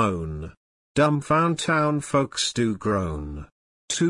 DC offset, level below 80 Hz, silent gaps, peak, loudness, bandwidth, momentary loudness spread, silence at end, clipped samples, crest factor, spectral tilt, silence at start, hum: under 0.1%; -46 dBFS; 0.57-0.95 s, 3.52-3.88 s; -8 dBFS; -24 LUFS; 11 kHz; 15 LU; 0 s; under 0.1%; 16 dB; -5 dB/octave; 0 s; none